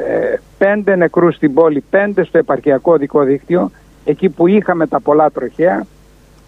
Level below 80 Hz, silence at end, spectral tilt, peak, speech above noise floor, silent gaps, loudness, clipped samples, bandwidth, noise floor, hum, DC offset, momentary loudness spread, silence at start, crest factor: -48 dBFS; 0.6 s; -9 dB/octave; 0 dBFS; 32 dB; none; -14 LUFS; under 0.1%; 6.2 kHz; -44 dBFS; none; under 0.1%; 6 LU; 0 s; 12 dB